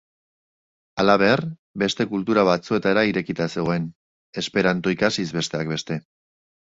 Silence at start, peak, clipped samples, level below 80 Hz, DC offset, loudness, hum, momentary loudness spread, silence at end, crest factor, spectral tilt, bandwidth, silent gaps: 0.95 s; -2 dBFS; under 0.1%; -56 dBFS; under 0.1%; -22 LUFS; none; 12 LU; 0.75 s; 20 dB; -5.5 dB/octave; 8 kHz; 1.59-1.74 s, 3.95-4.33 s